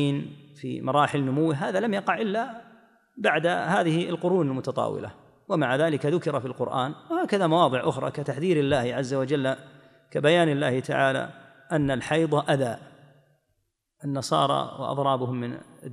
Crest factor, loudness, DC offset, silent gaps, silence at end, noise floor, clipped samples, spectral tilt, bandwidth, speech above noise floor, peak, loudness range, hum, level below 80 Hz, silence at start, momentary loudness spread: 18 dB; -25 LUFS; under 0.1%; none; 0 s; -75 dBFS; under 0.1%; -6 dB/octave; 12 kHz; 50 dB; -8 dBFS; 3 LU; none; -62 dBFS; 0 s; 10 LU